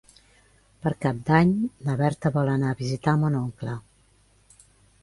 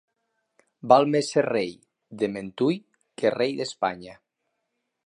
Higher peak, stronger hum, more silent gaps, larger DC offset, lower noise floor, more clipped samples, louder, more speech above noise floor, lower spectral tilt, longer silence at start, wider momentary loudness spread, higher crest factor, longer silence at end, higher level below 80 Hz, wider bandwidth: about the same, -4 dBFS vs -2 dBFS; first, 50 Hz at -55 dBFS vs none; neither; neither; second, -60 dBFS vs -79 dBFS; neither; about the same, -25 LUFS vs -25 LUFS; second, 37 dB vs 55 dB; first, -8 dB/octave vs -5.5 dB/octave; about the same, 0.85 s vs 0.85 s; second, 11 LU vs 14 LU; about the same, 22 dB vs 24 dB; first, 1.2 s vs 0.95 s; first, -54 dBFS vs -70 dBFS; about the same, 11.5 kHz vs 11 kHz